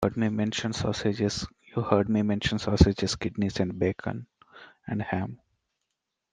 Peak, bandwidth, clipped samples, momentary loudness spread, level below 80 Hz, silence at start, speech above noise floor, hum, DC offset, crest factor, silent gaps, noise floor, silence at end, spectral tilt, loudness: -2 dBFS; 9.8 kHz; under 0.1%; 12 LU; -42 dBFS; 0 s; 57 dB; none; under 0.1%; 26 dB; none; -83 dBFS; 1 s; -6 dB/octave; -28 LUFS